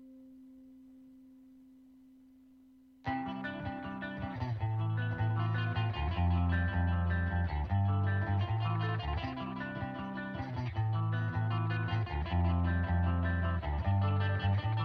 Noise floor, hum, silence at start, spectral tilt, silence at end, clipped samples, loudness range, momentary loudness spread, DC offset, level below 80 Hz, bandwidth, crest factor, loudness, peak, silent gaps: -60 dBFS; none; 0 s; -9 dB/octave; 0 s; under 0.1%; 10 LU; 8 LU; under 0.1%; -44 dBFS; 5.2 kHz; 14 dB; -34 LUFS; -20 dBFS; none